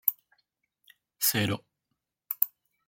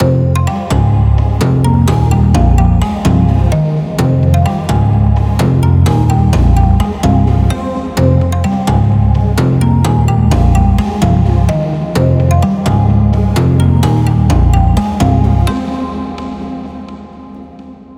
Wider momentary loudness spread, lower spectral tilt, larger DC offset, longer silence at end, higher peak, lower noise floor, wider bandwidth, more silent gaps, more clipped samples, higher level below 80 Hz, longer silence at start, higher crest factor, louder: about the same, 11 LU vs 9 LU; second, -3 dB/octave vs -7.5 dB/octave; neither; first, 0.4 s vs 0.05 s; about the same, -2 dBFS vs 0 dBFS; first, -83 dBFS vs -32 dBFS; about the same, 17 kHz vs 15.5 kHz; neither; neither; second, -70 dBFS vs -18 dBFS; about the same, 0.05 s vs 0 s; first, 30 dB vs 10 dB; second, -29 LUFS vs -11 LUFS